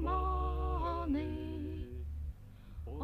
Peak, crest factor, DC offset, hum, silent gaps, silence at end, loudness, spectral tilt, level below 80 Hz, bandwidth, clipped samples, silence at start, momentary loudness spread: -24 dBFS; 14 dB; under 0.1%; none; none; 0 s; -38 LUFS; -9 dB/octave; -40 dBFS; 4.8 kHz; under 0.1%; 0 s; 14 LU